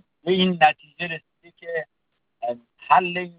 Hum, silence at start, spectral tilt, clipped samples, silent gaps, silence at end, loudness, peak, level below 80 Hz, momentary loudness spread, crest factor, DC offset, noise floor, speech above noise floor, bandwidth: none; 0.25 s; -7.5 dB/octave; under 0.1%; none; 0.05 s; -22 LUFS; -4 dBFS; -66 dBFS; 17 LU; 20 dB; under 0.1%; -73 dBFS; 52 dB; 5.2 kHz